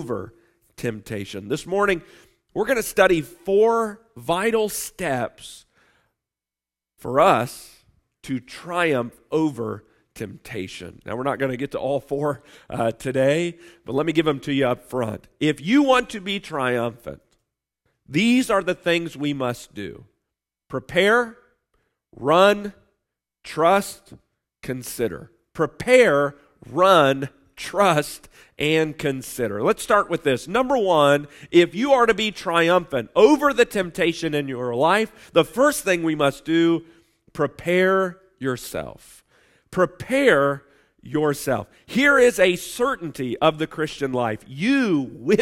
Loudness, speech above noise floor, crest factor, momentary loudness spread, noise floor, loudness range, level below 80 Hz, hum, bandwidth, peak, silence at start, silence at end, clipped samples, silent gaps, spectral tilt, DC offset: -21 LUFS; 69 dB; 20 dB; 16 LU; -90 dBFS; 6 LU; -54 dBFS; none; 16 kHz; -2 dBFS; 0 s; 0 s; under 0.1%; none; -5 dB/octave; under 0.1%